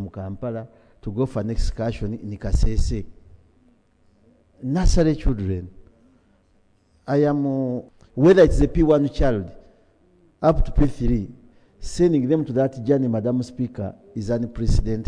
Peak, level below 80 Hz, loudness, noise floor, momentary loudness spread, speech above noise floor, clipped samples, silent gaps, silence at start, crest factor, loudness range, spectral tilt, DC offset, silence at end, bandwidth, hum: -2 dBFS; -28 dBFS; -22 LUFS; -60 dBFS; 14 LU; 40 dB; under 0.1%; none; 0 s; 20 dB; 8 LU; -7.5 dB/octave; under 0.1%; 0 s; 10 kHz; none